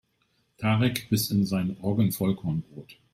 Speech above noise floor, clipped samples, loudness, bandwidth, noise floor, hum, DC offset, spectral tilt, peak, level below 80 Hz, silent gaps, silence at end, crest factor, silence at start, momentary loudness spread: 45 dB; under 0.1%; -27 LUFS; 16 kHz; -71 dBFS; none; under 0.1%; -6 dB/octave; -10 dBFS; -58 dBFS; none; 0.2 s; 18 dB; 0.6 s; 8 LU